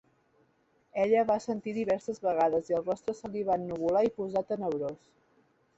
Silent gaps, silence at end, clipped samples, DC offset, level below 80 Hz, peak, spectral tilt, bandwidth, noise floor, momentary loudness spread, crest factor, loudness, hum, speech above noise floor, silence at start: none; 0.8 s; under 0.1%; under 0.1%; -68 dBFS; -14 dBFS; -6.5 dB/octave; 8.2 kHz; -70 dBFS; 9 LU; 16 dB; -30 LUFS; none; 40 dB; 0.95 s